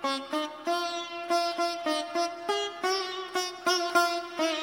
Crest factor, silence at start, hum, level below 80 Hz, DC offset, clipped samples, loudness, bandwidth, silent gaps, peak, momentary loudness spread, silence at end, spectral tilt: 20 dB; 0 s; none; -78 dBFS; under 0.1%; under 0.1%; -29 LUFS; 19.5 kHz; none; -10 dBFS; 6 LU; 0 s; -1 dB/octave